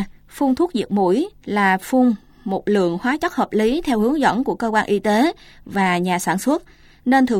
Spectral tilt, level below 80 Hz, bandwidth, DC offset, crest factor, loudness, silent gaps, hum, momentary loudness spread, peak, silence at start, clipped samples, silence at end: -5.5 dB/octave; -48 dBFS; 16.5 kHz; under 0.1%; 16 dB; -19 LUFS; none; none; 8 LU; -2 dBFS; 0 s; under 0.1%; 0 s